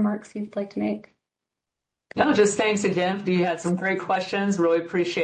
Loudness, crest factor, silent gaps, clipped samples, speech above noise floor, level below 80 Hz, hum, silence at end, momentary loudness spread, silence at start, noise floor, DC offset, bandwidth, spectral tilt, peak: -24 LUFS; 16 dB; none; under 0.1%; 63 dB; -64 dBFS; none; 0 s; 11 LU; 0 s; -86 dBFS; under 0.1%; 9.6 kHz; -5 dB/octave; -8 dBFS